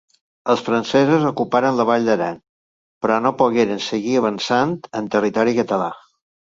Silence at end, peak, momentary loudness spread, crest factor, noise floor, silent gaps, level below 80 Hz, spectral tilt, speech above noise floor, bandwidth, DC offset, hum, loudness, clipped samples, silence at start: 0.6 s; -2 dBFS; 8 LU; 18 dB; under -90 dBFS; 2.49-3.01 s; -60 dBFS; -5.5 dB/octave; over 72 dB; 7.8 kHz; under 0.1%; none; -19 LUFS; under 0.1%; 0.45 s